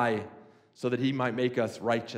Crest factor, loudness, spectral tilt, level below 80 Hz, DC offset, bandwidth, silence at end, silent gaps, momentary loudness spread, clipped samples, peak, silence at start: 16 dB; -30 LUFS; -6.5 dB/octave; -76 dBFS; under 0.1%; 12.5 kHz; 0 s; none; 7 LU; under 0.1%; -14 dBFS; 0 s